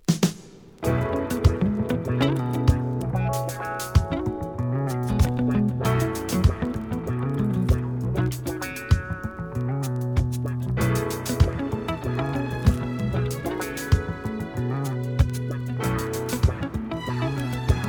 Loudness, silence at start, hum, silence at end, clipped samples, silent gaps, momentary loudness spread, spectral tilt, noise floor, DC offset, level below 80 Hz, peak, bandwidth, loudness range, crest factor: -25 LUFS; 0.1 s; none; 0 s; under 0.1%; none; 7 LU; -6.5 dB/octave; -45 dBFS; under 0.1%; -32 dBFS; -4 dBFS; over 20 kHz; 2 LU; 20 dB